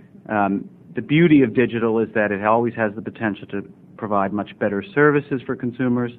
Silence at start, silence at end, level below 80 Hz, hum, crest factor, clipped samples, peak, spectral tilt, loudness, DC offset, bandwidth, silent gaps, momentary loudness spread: 0.3 s; 0 s; -58 dBFS; none; 18 dB; under 0.1%; -2 dBFS; -10.5 dB/octave; -20 LUFS; under 0.1%; 4.1 kHz; none; 13 LU